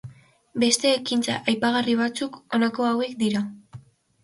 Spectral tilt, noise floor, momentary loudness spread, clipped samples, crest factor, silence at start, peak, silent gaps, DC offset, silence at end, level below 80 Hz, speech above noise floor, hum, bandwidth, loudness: -3.5 dB/octave; -47 dBFS; 8 LU; under 0.1%; 20 dB; 0.05 s; -4 dBFS; none; under 0.1%; 0.45 s; -66 dBFS; 23 dB; none; 11.5 kHz; -23 LUFS